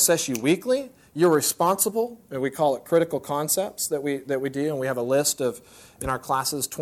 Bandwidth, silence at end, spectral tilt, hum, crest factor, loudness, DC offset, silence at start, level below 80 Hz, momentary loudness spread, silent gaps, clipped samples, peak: 18 kHz; 0 s; -3.5 dB/octave; none; 16 dB; -24 LUFS; under 0.1%; 0 s; -56 dBFS; 9 LU; none; under 0.1%; -8 dBFS